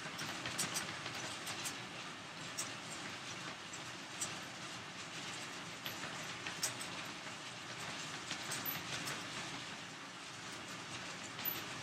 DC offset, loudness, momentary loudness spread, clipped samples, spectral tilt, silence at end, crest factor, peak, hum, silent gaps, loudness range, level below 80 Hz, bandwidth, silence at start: under 0.1%; -43 LUFS; 7 LU; under 0.1%; -1.5 dB/octave; 0 s; 24 dB; -22 dBFS; none; none; 2 LU; -78 dBFS; 16 kHz; 0 s